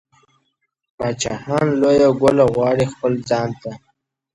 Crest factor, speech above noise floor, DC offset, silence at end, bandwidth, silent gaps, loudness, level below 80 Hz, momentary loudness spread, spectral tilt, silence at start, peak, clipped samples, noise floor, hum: 16 dB; 54 dB; under 0.1%; 0.55 s; 11.5 kHz; none; -17 LUFS; -50 dBFS; 12 LU; -6 dB/octave; 1 s; -2 dBFS; under 0.1%; -71 dBFS; none